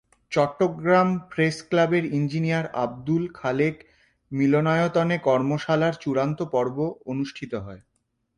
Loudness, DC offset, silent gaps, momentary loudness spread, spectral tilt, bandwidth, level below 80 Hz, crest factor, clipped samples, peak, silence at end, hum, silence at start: -24 LUFS; under 0.1%; none; 10 LU; -7 dB/octave; 10.5 kHz; -60 dBFS; 16 dB; under 0.1%; -8 dBFS; 0.6 s; none; 0.3 s